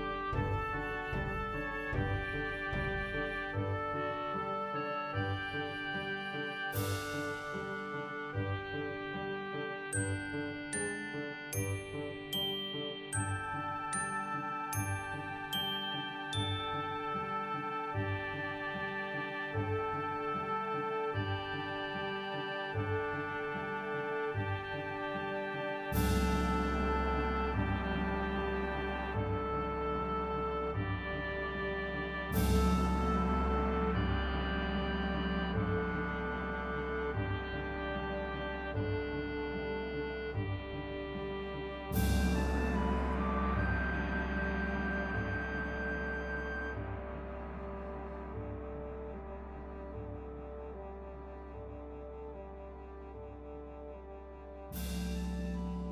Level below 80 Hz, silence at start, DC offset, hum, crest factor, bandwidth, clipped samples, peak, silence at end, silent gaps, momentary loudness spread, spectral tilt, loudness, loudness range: -44 dBFS; 0 s; under 0.1%; none; 18 dB; 16 kHz; under 0.1%; -18 dBFS; 0 s; none; 11 LU; -5.5 dB/octave; -36 LUFS; 10 LU